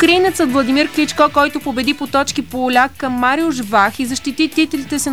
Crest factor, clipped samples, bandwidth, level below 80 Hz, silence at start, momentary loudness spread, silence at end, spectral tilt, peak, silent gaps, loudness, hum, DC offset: 14 dB; under 0.1%; over 20 kHz; -46 dBFS; 0 s; 6 LU; 0 s; -3 dB/octave; 0 dBFS; none; -15 LUFS; none; 0.8%